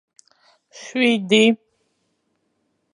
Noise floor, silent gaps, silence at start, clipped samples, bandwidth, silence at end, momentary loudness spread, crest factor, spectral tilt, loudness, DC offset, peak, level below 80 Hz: -70 dBFS; none; 0.75 s; under 0.1%; 11 kHz; 1.4 s; 14 LU; 18 dB; -4 dB/octave; -18 LUFS; under 0.1%; -4 dBFS; -76 dBFS